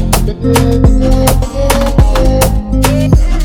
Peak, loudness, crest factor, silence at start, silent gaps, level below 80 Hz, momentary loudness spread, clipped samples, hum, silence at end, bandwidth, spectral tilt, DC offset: 0 dBFS; -11 LUFS; 8 dB; 0 s; none; -12 dBFS; 3 LU; 0.7%; none; 0 s; 18 kHz; -6 dB/octave; under 0.1%